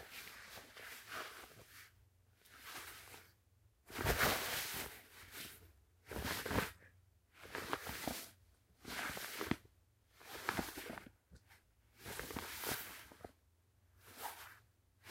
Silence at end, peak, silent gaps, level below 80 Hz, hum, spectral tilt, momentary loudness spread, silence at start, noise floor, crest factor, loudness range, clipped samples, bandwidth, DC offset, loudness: 0 s; -18 dBFS; none; -60 dBFS; none; -3 dB/octave; 20 LU; 0 s; -74 dBFS; 30 dB; 8 LU; under 0.1%; 16 kHz; under 0.1%; -44 LUFS